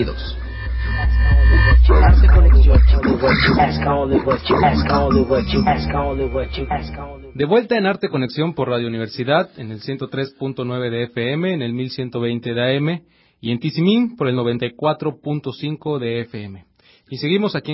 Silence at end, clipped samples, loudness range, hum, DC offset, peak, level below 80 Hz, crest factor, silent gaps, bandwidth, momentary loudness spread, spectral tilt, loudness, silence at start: 0 s; under 0.1%; 9 LU; none; under 0.1%; -2 dBFS; -20 dBFS; 14 dB; none; 5.8 kHz; 14 LU; -11 dB/octave; -18 LUFS; 0 s